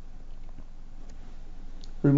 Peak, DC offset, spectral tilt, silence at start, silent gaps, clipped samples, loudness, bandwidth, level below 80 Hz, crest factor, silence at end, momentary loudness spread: -10 dBFS; under 0.1%; -9.5 dB/octave; 0 s; none; under 0.1%; -39 LUFS; 7.2 kHz; -38 dBFS; 20 dB; 0 s; 5 LU